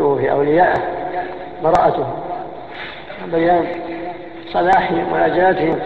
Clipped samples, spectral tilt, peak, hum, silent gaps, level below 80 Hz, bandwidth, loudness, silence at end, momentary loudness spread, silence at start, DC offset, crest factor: under 0.1%; -7.5 dB/octave; -2 dBFS; none; none; -46 dBFS; 8.2 kHz; -17 LUFS; 0 s; 15 LU; 0 s; 0.9%; 16 dB